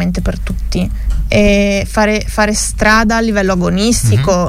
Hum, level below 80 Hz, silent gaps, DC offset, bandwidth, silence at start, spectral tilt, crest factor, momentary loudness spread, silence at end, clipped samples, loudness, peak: none; -20 dBFS; none; under 0.1%; 16 kHz; 0 s; -5 dB/octave; 12 dB; 9 LU; 0 s; under 0.1%; -13 LUFS; 0 dBFS